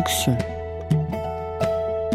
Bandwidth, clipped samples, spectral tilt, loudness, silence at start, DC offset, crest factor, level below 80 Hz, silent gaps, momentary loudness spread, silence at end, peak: 16 kHz; under 0.1%; -5 dB/octave; -25 LUFS; 0 s; under 0.1%; 16 dB; -40 dBFS; none; 8 LU; 0 s; -8 dBFS